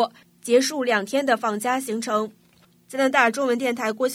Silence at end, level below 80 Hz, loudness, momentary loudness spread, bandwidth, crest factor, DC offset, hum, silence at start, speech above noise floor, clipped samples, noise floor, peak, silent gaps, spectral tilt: 0 s; -78 dBFS; -22 LUFS; 8 LU; 16 kHz; 20 dB; under 0.1%; none; 0 s; 35 dB; under 0.1%; -57 dBFS; -4 dBFS; none; -3 dB/octave